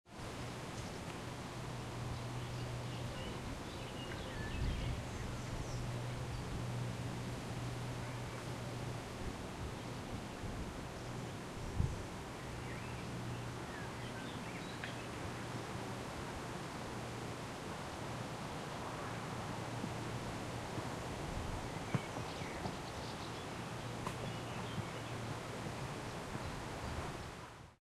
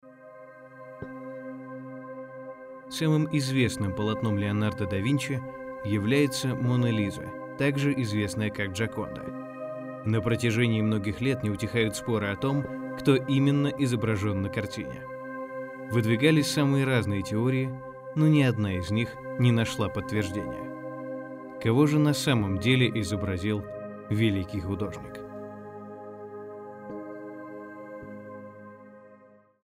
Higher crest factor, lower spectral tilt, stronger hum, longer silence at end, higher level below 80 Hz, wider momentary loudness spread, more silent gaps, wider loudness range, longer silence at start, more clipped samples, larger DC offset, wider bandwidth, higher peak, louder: about the same, 22 dB vs 20 dB; about the same, -5 dB/octave vs -6 dB/octave; neither; second, 0.1 s vs 0.5 s; about the same, -54 dBFS vs -58 dBFS; second, 4 LU vs 18 LU; neither; second, 2 LU vs 8 LU; about the same, 0.05 s vs 0.05 s; neither; neither; about the same, 15 kHz vs 16 kHz; second, -22 dBFS vs -8 dBFS; second, -44 LUFS vs -27 LUFS